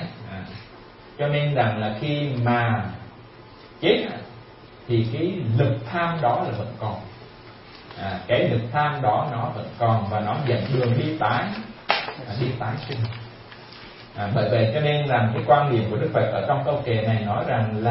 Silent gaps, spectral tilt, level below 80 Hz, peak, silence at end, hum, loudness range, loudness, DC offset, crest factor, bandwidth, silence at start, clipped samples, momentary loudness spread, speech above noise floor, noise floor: none; -11 dB/octave; -54 dBFS; -2 dBFS; 0 s; none; 4 LU; -23 LUFS; under 0.1%; 22 dB; 5.8 kHz; 0 s; under 0.1%; 20 LU; 23 dB; -45 dBFS